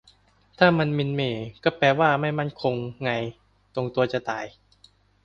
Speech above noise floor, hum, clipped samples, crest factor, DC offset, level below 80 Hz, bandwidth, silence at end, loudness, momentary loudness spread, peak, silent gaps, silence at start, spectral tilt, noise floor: 35 dB; none; under 0.1%; 22 dB; under 0.1%; -58 dBFS; 7.2 kHz; 0.75 s; -24 LUFS; 12 LU; -4 dBFS; none; 0.6 s; -7 dB/octave; -59 dBFS